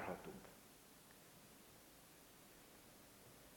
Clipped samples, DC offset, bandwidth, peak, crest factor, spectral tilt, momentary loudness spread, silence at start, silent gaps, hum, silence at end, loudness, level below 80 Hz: under 0.1%; under 0.1%; 17 kHz; -32 dBFS; 26 dB; -4 dB/octave; 8 LU; 0 s; none; none; 0 s; -60 LUFS; -78 dBFS